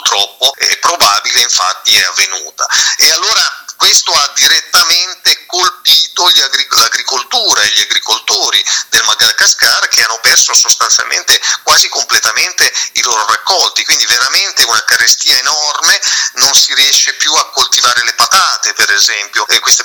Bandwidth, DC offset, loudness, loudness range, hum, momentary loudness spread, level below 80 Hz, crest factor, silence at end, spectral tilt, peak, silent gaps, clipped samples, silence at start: over 20 kHz; under 0.1%; -7 LUFS; 1 LU; none; 5 LU; -52 dBFS; 10 dB; 0 s; 3 dB/octave; 0 dBFS; none; 0.7%; 0 s